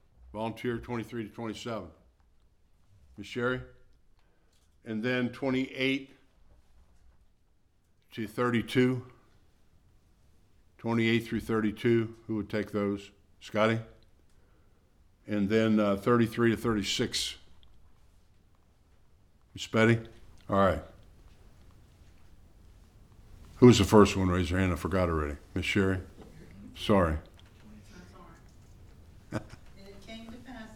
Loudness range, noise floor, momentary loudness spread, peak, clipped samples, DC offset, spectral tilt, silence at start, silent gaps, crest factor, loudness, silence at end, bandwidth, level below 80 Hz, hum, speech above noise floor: 12 LU; -66 dBFS; 20 LU; -6 dBFS; under 0.1%; under 0.1%; -6 dB/octave; 0.35 s; none; 26 dB; -29 LUFS; 0 s; 16.5 kHz; -52 dBFS; none; 38 dB